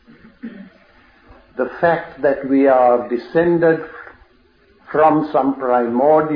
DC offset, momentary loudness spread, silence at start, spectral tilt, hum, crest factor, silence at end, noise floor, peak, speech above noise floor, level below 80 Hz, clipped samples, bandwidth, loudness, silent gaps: under 0.1%; 21 LU; 0.45 s; -10 dB/octave; none; 16 dB; 0 s; -54 dBFS; -2 dBFS; 38 dB; -54 dBFS; under 0.1%; 5.2 kHz; -16 LUFS; none